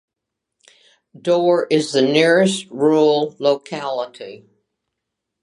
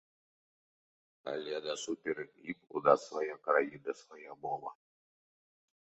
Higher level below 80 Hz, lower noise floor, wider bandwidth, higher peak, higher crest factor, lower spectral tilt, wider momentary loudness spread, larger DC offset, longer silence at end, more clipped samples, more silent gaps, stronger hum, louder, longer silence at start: first, -74 dBFS vs -82 dBFS; second, -81 dBFS vs under -90 dBFS; first, 11.5 kHz vs 8 kHz; first, -2 dBFS vs -10 dBFS; second, 18 dB vs 28 dB; first, -5 dB/octave vs -2.5 dB/octave; second, 13 LU vs 16 LU; neither; about the same, 1.05 s vs 1.15 s; neither; neither; neither; first, -17 LUFS vs -35 LUFS; about the same, 1.25 s vs 1.25 s